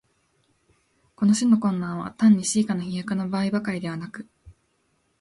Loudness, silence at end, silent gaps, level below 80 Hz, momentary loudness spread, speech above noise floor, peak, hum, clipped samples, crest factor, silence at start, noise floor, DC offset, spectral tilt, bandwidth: -23 LUFS; 0.7 s; none; -60 dBFS; 13 LU; 47 dB; -8 dBFS; none; under 0.1%; 16 dB; 1.2 s; -69 dBFS; under 0.1%; -5.5 dB/octave; 11.5 kHz